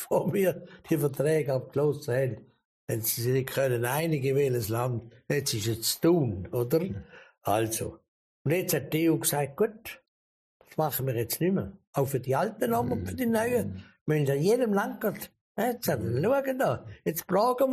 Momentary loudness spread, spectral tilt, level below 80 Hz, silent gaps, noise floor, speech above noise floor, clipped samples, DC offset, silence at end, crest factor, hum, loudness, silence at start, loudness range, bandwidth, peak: 10 LU; -5.5 dB/octave; -60 dBFS; 2.65-2.87 s, 8.08-8.45 s, 10.08-10.60 s, 11.87-11.93 s, 14.01-14.06 s, 15.41-15.55 s; under -90 dBFS; over 62 dB; under 0.1%; under 0.1%; 0 s; 16 dB; none; -28 LUFS; 0 s; 2 LU; 15 kHz; -14 dBFS